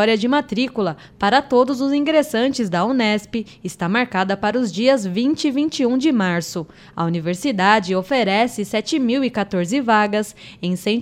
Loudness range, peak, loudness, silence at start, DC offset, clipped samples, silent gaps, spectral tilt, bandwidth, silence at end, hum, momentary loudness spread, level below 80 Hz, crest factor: 1 LU; 0 dBFS; -19 LUFS; 0 s; under 0.1%; under 0.1%; none; -5 dB/octave; 16 kHz; 0 s; none; 9 LU; -56 dBFS; 18 dB